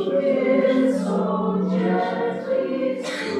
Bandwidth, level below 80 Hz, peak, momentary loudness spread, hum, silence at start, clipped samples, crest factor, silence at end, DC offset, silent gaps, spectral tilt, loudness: 11 kHz; -64 dBFS; -8 dBFS; 6 LU; none; 0 s; under 0.1%; 14 dB; 0 s; under 0.1%; none; -7 dB/octave; -22 LUFS